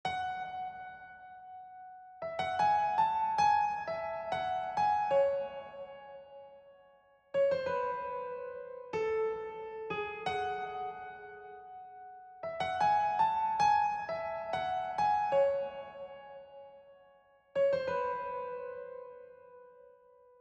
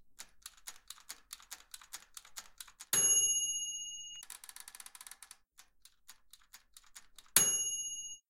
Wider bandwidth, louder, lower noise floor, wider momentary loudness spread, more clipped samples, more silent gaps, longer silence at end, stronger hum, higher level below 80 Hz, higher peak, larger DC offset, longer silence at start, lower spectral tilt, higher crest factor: second, 8.6 kHz vs 17 kHz; second, -33 LUFS vs -30 LUFS; about the same, -64 dBFS vs -65 dBFS; second, 21 LU vs 24 LU; neither; neither; first, 0.55 s vs 0.15 s; neither; about the same, -70 dBFS vs -74 dBFS; second, -18 dBFS vs -6 dBFS; neither; about the same, 0.05 s vs 0.05 s; first, -4 dB/octave vs 1.5 dB/octave; second, 16 dB vs 34 dB